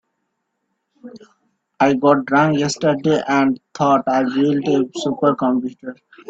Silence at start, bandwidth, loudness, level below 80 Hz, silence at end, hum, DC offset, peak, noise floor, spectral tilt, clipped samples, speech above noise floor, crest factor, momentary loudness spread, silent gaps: 1.05 s; 8 kHz; -17 LUFS; -62 dBFS; 0.35 s; none; under 0.1%; -2 dBFS; -73 dBFS; -6 dB/octave; under 0.1%; 56 dB; 16 dB; 7 LU; none